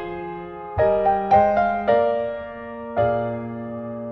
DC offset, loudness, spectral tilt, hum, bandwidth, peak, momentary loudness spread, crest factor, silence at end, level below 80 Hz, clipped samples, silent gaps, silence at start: under 0.1%; -21 LUFS; -8.5 dB/octave; none; 6 kHz; -4 dBFS; 15 LU; 18 dB; 0 s; -46 dBFS; under 0.1%; none; 0 s